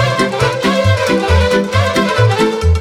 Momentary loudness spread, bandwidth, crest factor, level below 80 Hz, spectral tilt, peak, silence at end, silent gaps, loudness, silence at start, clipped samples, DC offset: 2 LU; 14.5 kHz; 12 dB; -24 dBFS; -5.5 dB/octave; 0 dBFS; 0 s; none; -13 LUFS; 0 s; under 0.1%; under 0.1%